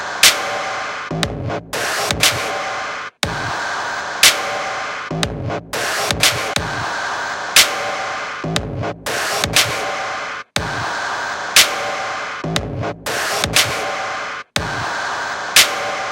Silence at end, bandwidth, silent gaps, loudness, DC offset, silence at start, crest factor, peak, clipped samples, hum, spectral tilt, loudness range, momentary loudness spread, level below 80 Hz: 0 s; 17 kHz; none; -17 LUFS; under 0.1%; 0 s; 20 dB; 0 dBFS; under 0.1%; none; -1.5 dB/octave; 3 LU; 12 LU; -44 dBFS